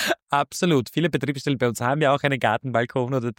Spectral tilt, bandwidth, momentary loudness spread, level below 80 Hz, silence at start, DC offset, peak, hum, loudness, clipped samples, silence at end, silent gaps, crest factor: -5.5 dB/octave; 17 kHz; 4 LU; -62 dBFS; 0 s; under 0.1%; -6 dBFS; none; -23 LUFS; under 0.1%; 0.05 s; 0.22-0.27 s; 16 dB